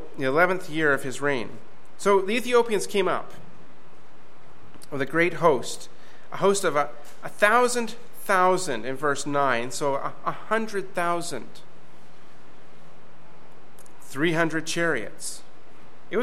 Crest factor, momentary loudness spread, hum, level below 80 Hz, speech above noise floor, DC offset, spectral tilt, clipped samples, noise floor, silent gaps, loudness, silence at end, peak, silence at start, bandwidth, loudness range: 24 dB; 15 LU; none; -66 dBFS; 28 dB; 3%; -4 dB/octave; under 0.1%; -53 dBFS; none; -25 LUFS; 0 s; -4 dBFS; 0 s; 16 kHz; 8 LU